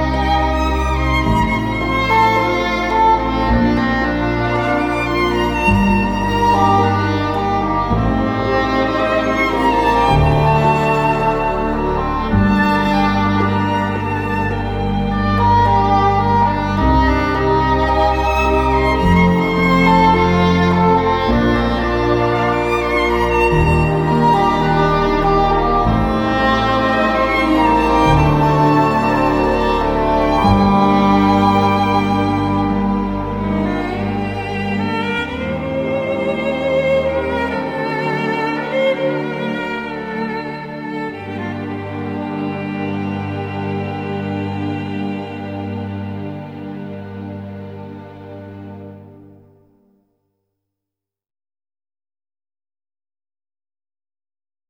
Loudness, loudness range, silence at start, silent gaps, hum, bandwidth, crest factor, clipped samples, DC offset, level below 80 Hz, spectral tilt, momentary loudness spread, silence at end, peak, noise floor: -16 LUFS; 10 LU; 0 s; none; none; 17.5 kHz; 16 dB; under 0.1%; under 0.1%; -28 dBFS; -7 dB/octave; 12 LU; 5.55 s; 0 dBFS; -84 dBFS